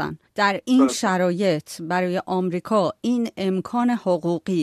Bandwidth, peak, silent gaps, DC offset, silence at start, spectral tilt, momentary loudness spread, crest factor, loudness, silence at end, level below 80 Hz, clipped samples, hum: 14 kHz; -6 dBFS; none; under 0.1%; 0 s; -5.5 dB/octave; 6 LU; 16 dB; -22 LUFS; 0 s; -64 dBFS; under 0.1%; none